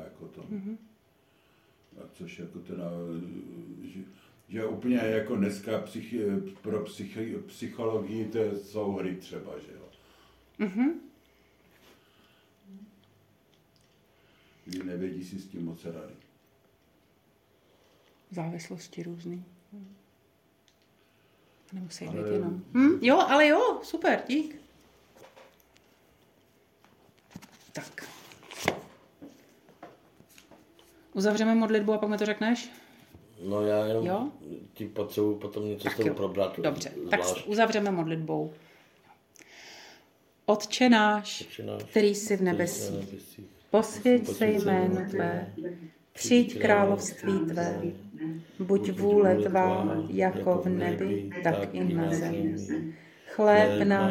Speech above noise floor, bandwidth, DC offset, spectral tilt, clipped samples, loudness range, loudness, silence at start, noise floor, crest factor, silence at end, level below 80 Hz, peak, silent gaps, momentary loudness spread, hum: 38 dB; 16.5 kHz; under 0.1%; -5.5 dB/octave; under 0.1%; 16 LU; -28 LUFS; 0 s; -66 dBFS; 22 dB; 0 s; -72 dBFS; -8 dBFS; none; 21 LU; none